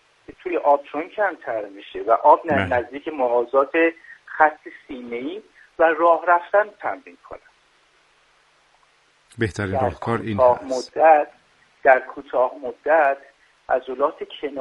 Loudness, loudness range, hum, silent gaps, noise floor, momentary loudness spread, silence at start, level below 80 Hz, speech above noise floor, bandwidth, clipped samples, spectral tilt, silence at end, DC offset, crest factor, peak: -20 LUFS; 6 LU; none; none; -59 dBFS; 15 LU; 0.3 s; -58 dBFS; 39 dB; 10.5 kHz; under 0.1%; -6.5 dB/octave; 0 s; under 0.1%; 20 dB; -2 dBFS